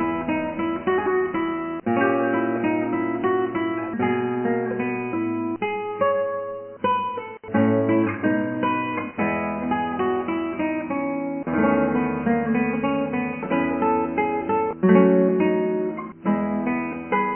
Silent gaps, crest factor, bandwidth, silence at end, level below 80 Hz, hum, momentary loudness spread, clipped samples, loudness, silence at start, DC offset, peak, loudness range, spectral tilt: none; 18 dB; 3.3 kHz; 0 s; -54 dBFS; none; 7 LU; under 0.1%; -23 LUFS; 0 s; under 0.1%; -4 dBFS; 4 LU; -11 dB/octave